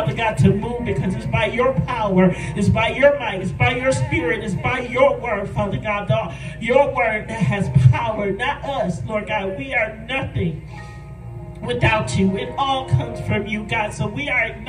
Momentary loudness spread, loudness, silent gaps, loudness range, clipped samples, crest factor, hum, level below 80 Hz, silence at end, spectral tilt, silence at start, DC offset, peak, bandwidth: 9 LU; -20 LUFS; none; 4 LU; under 0.1%; 20 dB; none; -38 dBFS; 0 s; -6.5 dB/octave; 0 s; under 0.1%; 0 dBFS; 10.5 kHz